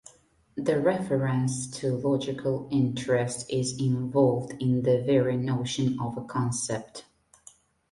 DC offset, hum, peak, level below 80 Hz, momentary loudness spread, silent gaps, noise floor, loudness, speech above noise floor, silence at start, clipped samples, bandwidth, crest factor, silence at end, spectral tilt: under 0.1%; none; -8 dBFS; -60 dBFS; 8 LU; none; -61 dBFS; -27 LUFS; 34 dB; 0.55 s; under 0.1%; 11.5 kHz; 18 dB; 0.9 s; -6 dB/octave